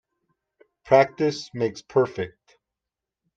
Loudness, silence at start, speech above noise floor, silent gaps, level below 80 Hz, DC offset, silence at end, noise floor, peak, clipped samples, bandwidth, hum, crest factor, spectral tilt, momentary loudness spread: -23 LUFS; 0.85 s; 65 dB; none; -64 dBFS; under 0.1%; 1.1 s; -87 dBFS; -4 dBFS; under 0.1%; 7.8 kHz; none; 22 dB; -6 dB/octave; 12 LU